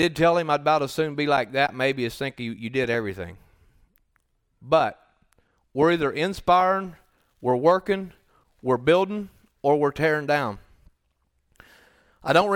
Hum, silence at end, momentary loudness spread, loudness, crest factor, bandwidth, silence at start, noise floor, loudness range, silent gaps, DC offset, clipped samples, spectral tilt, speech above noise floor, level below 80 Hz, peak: none; 0 s; 13 LU; -23 LUFS; 20 dB; 18.5 kHz; 0 s; -71 dBFS; 5 LU; none; under 0.1%; under 0.1%; -6 dB/octave; 48 dB; -56 dBFS; -6 dBFS